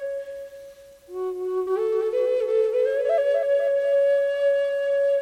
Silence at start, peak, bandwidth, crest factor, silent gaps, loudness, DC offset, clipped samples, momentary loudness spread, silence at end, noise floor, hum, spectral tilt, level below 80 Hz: 0 s; -14 dBFS; 9.4 kHz; 10 dB; none; -23 LUFS; under 0.1%; under 0.1%; 12 LU; 0 s; -45 dBFS; none; -4 dB/octave; -66 dBFS